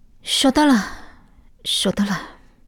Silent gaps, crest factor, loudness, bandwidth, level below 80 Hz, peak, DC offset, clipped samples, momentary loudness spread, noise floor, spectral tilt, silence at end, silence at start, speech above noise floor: none; 16 dB; -19 LUFS; 18 kHz; -46 dBFS; -4 dBFS; under 0.1%; under 0.1%; 15 LU; -48 dBFS; -3.5 dB/octave; 0.35 s; 0.25 s; 30 dB